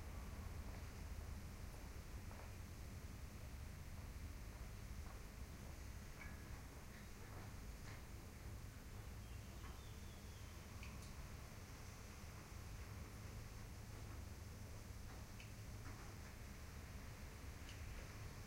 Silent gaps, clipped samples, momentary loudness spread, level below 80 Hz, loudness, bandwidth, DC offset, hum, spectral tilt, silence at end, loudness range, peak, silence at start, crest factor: none; under 0.1%; 2 LU; -56 dBFS; -55 LUFS; 16 kHz; under 0.1%; none; -5 dB/octave; 0 s; 1 LU; -38 dBFS; 0 s; 14 dB